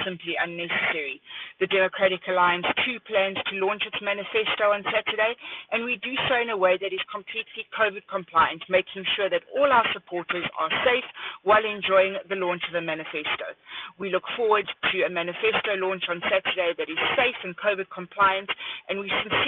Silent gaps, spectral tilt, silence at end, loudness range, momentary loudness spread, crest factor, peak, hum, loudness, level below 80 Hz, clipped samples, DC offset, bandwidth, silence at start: none; -6.5 dB/octave; 0 s; 2 LU; 9 LU; 18 dB; -8 dBFS; none; -25 LUFS; -64 dBFS; under 0.1%; under 0.1%; 4.4 kHz; 0 s